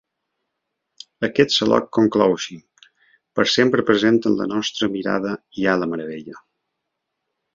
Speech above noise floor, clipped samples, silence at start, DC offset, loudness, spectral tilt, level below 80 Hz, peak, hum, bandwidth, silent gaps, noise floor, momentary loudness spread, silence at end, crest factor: 60 dB; under 0.1%; 1.2 s; under 0.1%; -19 LUFS; -4.5 dB/octave; -58 dBFS; -2 dBFS; none; 7.6 kHz; none; -79 dBFS; 12 LU; 1.15 s; 20 dB